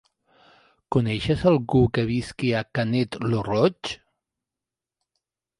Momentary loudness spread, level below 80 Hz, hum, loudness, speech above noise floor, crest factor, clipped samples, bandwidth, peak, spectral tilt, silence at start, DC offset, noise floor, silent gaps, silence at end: 6 LU; -48 dBFS; none; -23 LUFS; 66 dB; 18 dB; under 0.1%; 11.5 kHz; -6 dBFS; -7 dB/octave; 0.9 s; under 0.1%; -89 dBFS; none; 1.65 s